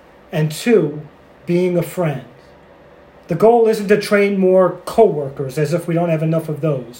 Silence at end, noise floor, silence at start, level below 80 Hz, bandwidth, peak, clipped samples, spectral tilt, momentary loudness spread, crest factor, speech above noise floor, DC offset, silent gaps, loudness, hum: 0 s; -44 dBFS; 0.3 s; -54 dBFS; 16.5 kHz; 0 dBFS; under 0.1%; -7 dB/octave; 11 LU; 16 dB; 29 dB; under 0.1%; none; -16 LUFS; none